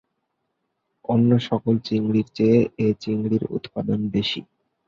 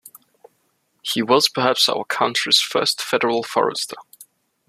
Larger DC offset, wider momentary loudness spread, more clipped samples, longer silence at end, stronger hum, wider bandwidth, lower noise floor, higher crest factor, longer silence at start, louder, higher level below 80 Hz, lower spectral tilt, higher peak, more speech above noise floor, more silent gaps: neither; about the same, 9 LU vs 11 LU; neither; about the same, 0.45 s vs 0.45 s; neither; second, 7.2 kHz vs 15 kHz; first, -76 dBFS vs -67 dBFS; about the same, 18 dB vs 20 dB; first, 1.1 s vs 0.05 s; second, -22 LUFS vs -18 LUFS; first, -56 dBFS vs -68 dBFS; first, -8 dB/octave vs -2 dB/octave; second, -6 dBFS vs -2 dBFS; first, 55 dB vs 47 dB; neither